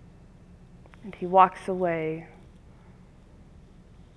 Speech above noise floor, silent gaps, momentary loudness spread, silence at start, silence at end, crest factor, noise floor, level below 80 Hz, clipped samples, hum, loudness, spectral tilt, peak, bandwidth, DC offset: 27 dB; none; 25 LU; 1.05 s; 1.9 s; 24 dB; -52 dBFS; -56 dBFS; under 0.1%; none; -25 LUFS; -7.5 dB/octave; -4 dBFS; 11 kHz; under 0.1%